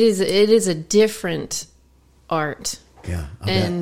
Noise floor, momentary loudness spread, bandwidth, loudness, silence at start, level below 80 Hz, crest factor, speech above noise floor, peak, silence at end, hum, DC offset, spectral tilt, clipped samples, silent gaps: -54 dBFS; 14 LU; 16.5 kHz; -20 LUFS; 0 s; -44 dBFS; 16 dB; 35 dB; -4 dBFS; 0 s; none; under 0.1%; -4.5 dB/octave; under 0.1%; none